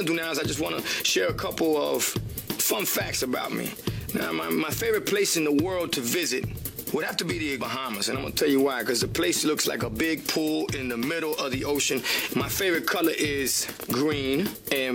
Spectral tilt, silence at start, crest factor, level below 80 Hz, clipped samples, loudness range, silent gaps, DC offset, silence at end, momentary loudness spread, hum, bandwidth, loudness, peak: -3 dB/octave; 0 s; 18 dB; -50 dBFS; under 0.1%; 1 LU; none; under 0.1%; 0 s; 6 LU; none; 18 kHz; -26 LUFS; -8 dBFS